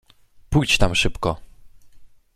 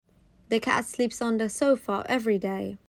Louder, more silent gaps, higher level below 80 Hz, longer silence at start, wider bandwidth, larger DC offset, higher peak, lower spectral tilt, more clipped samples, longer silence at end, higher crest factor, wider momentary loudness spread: first, -20 LUFS vs -27 LUFS; neither; first, -32 dBFS vs -62 dBFS; about the same, 0.5 s vs 0.5 s; second, 14 kHz vs 19.5 kHz; neither; first, -2 dBFS vs -8 dBFS; about the same, -4 dB/octave vs -4.5 dB/octave; neither; first, 0.3 s vs 0.1 s; about the same, 22 dB vs 18 dB; first, 9 LU vs 5 LU